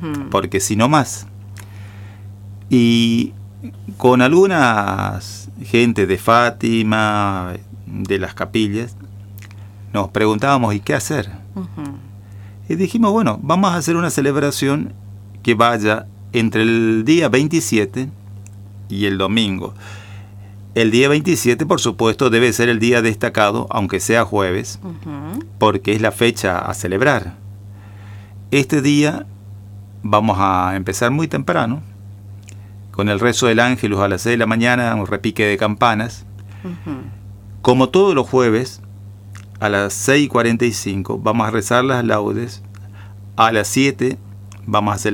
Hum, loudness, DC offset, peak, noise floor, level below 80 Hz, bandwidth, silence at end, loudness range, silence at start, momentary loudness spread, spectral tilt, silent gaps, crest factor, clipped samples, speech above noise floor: none; -16 LUFS; under 0.1%; 0 dBFS; -36 dBFS; -50 dBFS; 18.5 kHz; 0 s; 4 LU; 0 s; 23 LU; -5 dB/octave; none; 18 dB; under 0.1%; 20 dB